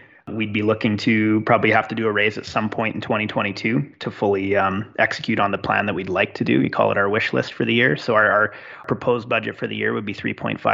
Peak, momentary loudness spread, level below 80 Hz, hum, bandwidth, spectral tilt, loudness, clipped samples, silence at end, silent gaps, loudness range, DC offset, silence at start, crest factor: -2 dBFS; 7 LU; -58 dBFS; none; 7.8 kHz; -4 dB/octave; -20 LUFS; under 0.1%; 0 s; none; 2 LU; under 0.1%; 0.25 s; 18 dB